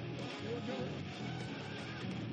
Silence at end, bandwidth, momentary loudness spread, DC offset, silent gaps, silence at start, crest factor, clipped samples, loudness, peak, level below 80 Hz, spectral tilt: 0 s; 9.4 kHz; 3 LU; under 0.1%; none; 0 s; 14 dB; under 0.1%; -42 LUFS; -28 dBFS; -68 dBFS; -6 dB/octave